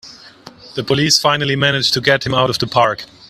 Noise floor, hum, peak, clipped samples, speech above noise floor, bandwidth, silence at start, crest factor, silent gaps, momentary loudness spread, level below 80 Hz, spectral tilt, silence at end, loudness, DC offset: -40 dBFS; none; 0 dBFS; under 0.1%; 25 dB; 16 kHz; 0.05 s; 16 dB; none; 6 LU; -50 dBFS; -3.5 dB/octave; 0.25 s; -14 LUFS; under 0.1%